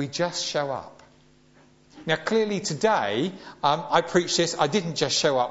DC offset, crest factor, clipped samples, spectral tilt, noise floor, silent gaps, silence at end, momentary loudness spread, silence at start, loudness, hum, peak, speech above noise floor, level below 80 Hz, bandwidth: under 0.1%; 20 dB; under 0.1%; -3.5 dB/octave; -57 dBFS; none; 0 s; 6 LU; 0 s; -24 LUFS; none; -6 dBFS; 32 dB; -64 dBFS; 8 kHz